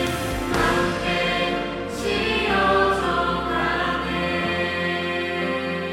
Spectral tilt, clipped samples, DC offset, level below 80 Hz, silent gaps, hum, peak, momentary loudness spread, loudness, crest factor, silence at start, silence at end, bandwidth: -4.5 dB/octave; under 0.1%; under 0.1%; -40 dBFS; none; none; -6 dBFS; 5 LU; -22 LUFS; 16 dB; 0 s; 0 s; 16 kHz